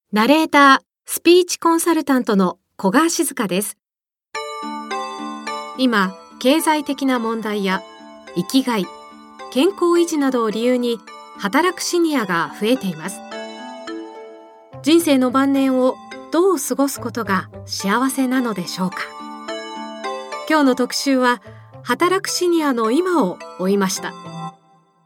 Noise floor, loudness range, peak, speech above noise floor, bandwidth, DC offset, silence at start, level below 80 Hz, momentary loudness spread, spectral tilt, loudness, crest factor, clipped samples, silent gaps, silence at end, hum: under -90 dBFS; 4 LU; 0 dBFS; over 73 dB; 17.5 kHz; under 0.1%; 0.1 s; -66 dBFS; 15 LU; -4 dB/octave; -19 LUFS; 18 dB; under 0.1%; none; 0.55 s; none